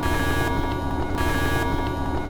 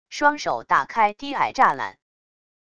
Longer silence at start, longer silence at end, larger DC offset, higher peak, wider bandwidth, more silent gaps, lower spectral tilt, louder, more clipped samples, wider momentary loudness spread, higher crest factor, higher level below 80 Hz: about the same, 0 s vs 0.1 s; second, 0 s vs 0.8 s; second, under 0.1% vs 0.4%; second, -10 dBFS vs -4 dBFS; first, 19.5 kHz vs 9.6 kHz; neither; first, -5.5 dB/octave vs -3 dB/octave; second, -25 LUFS vs -21 LUFS; neither; second, 3 LU vs 9 LU; second, 12 dB vs 20 dB; first, -30 dBFS vs -60 dBFS